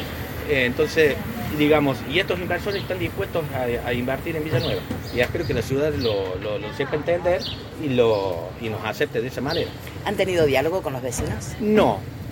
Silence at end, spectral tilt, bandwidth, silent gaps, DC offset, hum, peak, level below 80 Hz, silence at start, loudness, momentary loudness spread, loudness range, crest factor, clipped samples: 0 s; -5.5 dB/octave; 17 kHz; none; under 0.1%; none; -4 dBFS; -42 dBFS; 0 s; -23 LUFS; 9 LU; 3 LU; 18 dB; under 0.1%